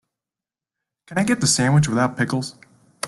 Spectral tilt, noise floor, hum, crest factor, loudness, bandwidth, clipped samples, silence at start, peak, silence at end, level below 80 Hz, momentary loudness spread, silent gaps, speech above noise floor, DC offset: -4.5 dB/octave; -89 dBFS; none; 18 dB; -20 LUFS; 12.5 kHz; under 0.1%; 1.1 s; -6 dBFS; 0 s; -50 dBFS; 11 LU; none; 70 dB; under 0.1%